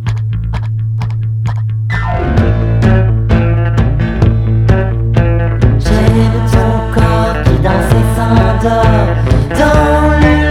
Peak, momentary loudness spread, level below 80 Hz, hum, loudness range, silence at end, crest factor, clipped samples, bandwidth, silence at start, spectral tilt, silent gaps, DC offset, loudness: 0 dBFS; 7 LU; -16 dBFS; none; 2 LU; 0 s; 10 dB; 0.4%; 12.5 kHz; 0 s; -7.5 dB/octave; none; under 0.1%; -11 LUFS